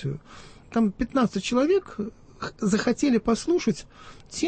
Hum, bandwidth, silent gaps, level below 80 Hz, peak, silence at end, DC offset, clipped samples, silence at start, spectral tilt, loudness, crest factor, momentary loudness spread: none; 8.8 kHz; none; -50 dBFS; -10 dBFS; 0 s; under 0.1%; under 0.1%; 0 s; -5.5 dB/octave; -25 LUFS; 16 dB; 14 LU